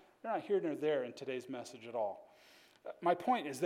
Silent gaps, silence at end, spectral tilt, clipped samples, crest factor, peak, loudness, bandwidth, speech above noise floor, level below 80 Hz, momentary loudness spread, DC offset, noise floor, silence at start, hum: none; 0 s; -5 dB/octave; under 0.1%; 20 dB; -18 dBFS; -38 LUFS; 16 kHz; 27 dB; -90 dBFS; 13 LU; under 0.1%; -64 dBFS; 0.25 s; none